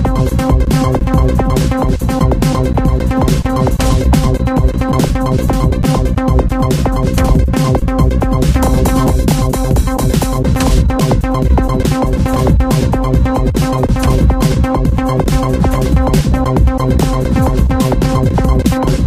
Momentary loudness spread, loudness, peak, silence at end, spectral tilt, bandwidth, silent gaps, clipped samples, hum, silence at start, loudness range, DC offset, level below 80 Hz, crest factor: 2 LU; -13 LUFS; 0 dBFS; 0 s; -7 dB/octave; 16 kHz; none; under 0.1%; none; 0 s; 1 LU; 0.3%; -14 dBFS; 10 dB